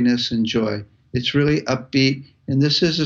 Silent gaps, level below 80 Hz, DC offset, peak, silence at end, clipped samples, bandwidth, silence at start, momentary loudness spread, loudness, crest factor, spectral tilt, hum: none; -48 dBFS; under 0.1%; -4 dBFS; 0 s; under 0.1%; 7.6 kHz; 0 s; 9 LU; -20 LUFS; 14 dB; -5.5 dB/octave; none